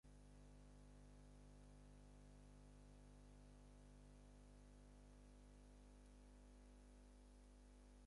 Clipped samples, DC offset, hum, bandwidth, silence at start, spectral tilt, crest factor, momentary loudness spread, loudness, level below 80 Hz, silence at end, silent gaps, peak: under 0.1%; under 0.1%; 50 Hz at -65 dBFS; 11 kHz; 0.05 s; -6 dB/octave; 10 dB; 1 LU; -67 LUFS; -66 dBFS; 0 s; none; -54 dBFS